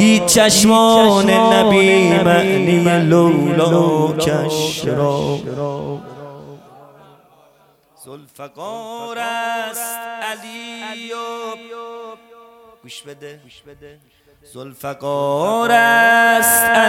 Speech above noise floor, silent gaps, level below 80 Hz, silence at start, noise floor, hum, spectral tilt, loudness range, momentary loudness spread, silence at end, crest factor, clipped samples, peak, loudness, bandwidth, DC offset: 38 dB; none; -52 dBFS; 0 s; -54 dBFS; none; -4 dB/octave; 21 LU; 22 LU; 0 s; 14 dB; under 0.1%; -2 dBFS; -14 LUFS; 18 kHz; under 0.1%